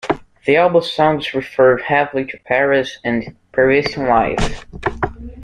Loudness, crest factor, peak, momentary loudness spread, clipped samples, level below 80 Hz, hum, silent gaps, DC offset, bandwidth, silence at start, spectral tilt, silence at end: -17 LUFS; 16 dB; -2 dBFS; 10 LU; under 0.1%; -36 dBFS; none; none; under 0.1%; 10 kHz; 0.05 s; -5.5 dB/octave; 0 s